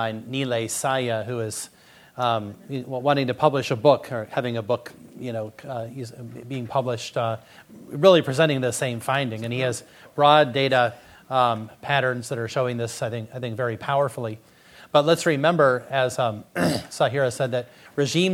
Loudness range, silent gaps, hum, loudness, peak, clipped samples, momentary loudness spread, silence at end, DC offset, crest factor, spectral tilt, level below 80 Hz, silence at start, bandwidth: 5 LU; none; none; -23 LUFS; 0 dBFS; under 0.1%; 15 LU; 0 s; under 0.1%; 22 dB; -5 dB/octave; -64 dBFS; 0 s; 16.5 kHz